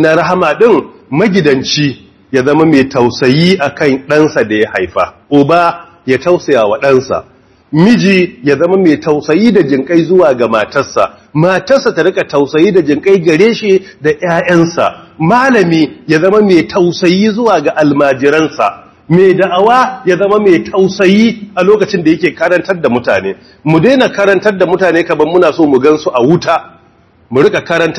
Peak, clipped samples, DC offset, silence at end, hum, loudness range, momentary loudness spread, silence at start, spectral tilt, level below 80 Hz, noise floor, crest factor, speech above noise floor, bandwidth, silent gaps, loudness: 0 dBFS; 2%; under 0.1%; 0 s; none; 1 LU; 6 LU; 0 s; -6 dB/octave; -50 dBFS; -46 dBFS; 10 dB; 37 dB; 11 kHz; none; -9 LUFS